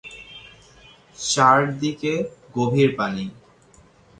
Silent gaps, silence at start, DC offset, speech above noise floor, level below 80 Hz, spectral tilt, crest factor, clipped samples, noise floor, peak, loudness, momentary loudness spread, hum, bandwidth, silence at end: none; 0.05 s; under 0.1%; 33 dB; -58 dBFS; -4.5 dB/octave; 22 dB; under 0.1%; -53 dBFS; -2 dBFS; -21 LUFS; 23 LU; none; 11 kHz; 0.85 s